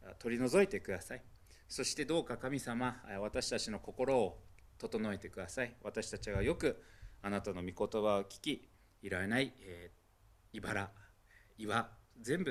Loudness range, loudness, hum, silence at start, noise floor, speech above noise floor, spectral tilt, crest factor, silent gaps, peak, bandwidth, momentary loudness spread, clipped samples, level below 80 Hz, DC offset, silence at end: 4 LU; -38 LUFS; none; 0 s; -67 dBFS; 29 dB; -4.5 dB/octave; 22 dB; none; -16 dBFS; 15 kHz; 15 LU; under 0.1%; -58 dBFS; under 0.1%; 0 s